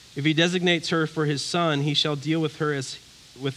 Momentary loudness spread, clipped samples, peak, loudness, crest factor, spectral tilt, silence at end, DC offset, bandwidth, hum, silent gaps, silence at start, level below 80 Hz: 10 LU; under 0.1%; -6 dBFS; -24 LUFS; 18 dB; -5 dB/octave; 0 s; under 0.1%; 12.5 kHz; none; none; 0.15 s; -66 dBFS